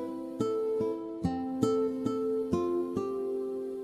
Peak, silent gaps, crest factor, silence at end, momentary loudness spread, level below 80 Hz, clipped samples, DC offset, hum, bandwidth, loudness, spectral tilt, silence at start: -14 dBFS; none; 18 dB; 0 s; 5 LU; -56 dBFS; under 0.1%; under 0.1%; none; 14 kHz; -32 LUFS; -7.5 dB/octave; 0 s